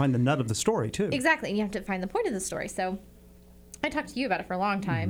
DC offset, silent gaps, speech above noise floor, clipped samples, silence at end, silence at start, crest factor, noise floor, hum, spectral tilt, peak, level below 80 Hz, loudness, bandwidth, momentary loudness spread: under 0.1%; none; 24 dB; under 0.1%; 0 s; 0 s; 18 dB; -52 dBFS; none; -5 dB/octave; -10 dBFS; -54 dBFS; -28 LUFS; 19.5 kHz; 8 LU